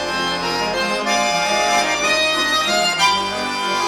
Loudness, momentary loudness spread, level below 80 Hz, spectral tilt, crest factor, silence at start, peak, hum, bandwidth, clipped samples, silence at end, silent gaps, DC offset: -17 LUFS; 5 LU; -48 dBFS; -1.5 dB/octave; 16 dB; 0 s; -4 dBFS; none; 18 kHz; under 0.1%; 0 s; none; under 0.1%